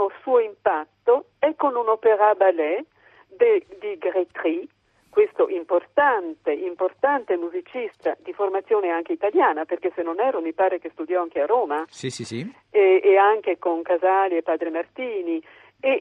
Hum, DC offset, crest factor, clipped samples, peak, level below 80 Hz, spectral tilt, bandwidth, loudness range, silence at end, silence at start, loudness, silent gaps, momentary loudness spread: none; under 0.1%; 18 dB; under 0.1%; -4 dBFS; -72 dBFS; -5.5 dB/octave; 10 kHz; 3 LU; 0 s; 0 s; -22 LUFS; none; 11 LU